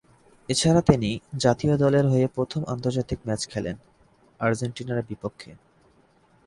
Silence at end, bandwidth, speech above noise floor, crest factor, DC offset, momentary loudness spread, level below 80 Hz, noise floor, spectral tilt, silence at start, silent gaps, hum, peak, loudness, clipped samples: 0.95 s; 11.5 kHz; 36 dB; 22 dB; under 0.1%; 15 LU; -48 dBFS; -60 dBFS; -6 dB/octave; 0.5 s; none; none; -2 dBFS; -24 LUFS; under 0.1%